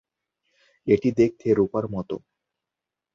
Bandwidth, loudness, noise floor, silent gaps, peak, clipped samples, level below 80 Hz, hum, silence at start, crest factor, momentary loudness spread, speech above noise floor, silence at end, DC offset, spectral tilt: 7.6 kHz; -23 LUFS; -87 dBFS; none; -6 dBFS; under 0.1%; -56 dBFS; none; 0.85 s; 20 dB; 14 LU; 65 dB; 0.95 s; under 0.1%; -8.5 dB/octave